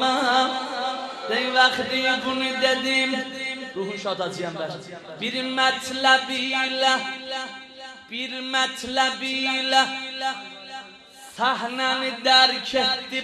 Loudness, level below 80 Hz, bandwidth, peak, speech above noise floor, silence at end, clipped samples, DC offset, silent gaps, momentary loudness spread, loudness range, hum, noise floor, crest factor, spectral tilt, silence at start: -22 LUFS; -66 dBFS; 13.5 kHz; -2 dBFS; 22 dB; 0 s; under 0.1%; under 0.1%; none; 15 LU; 3 LU; none; -45 dBFS; 22 dB; -2 dB/octave; 0 s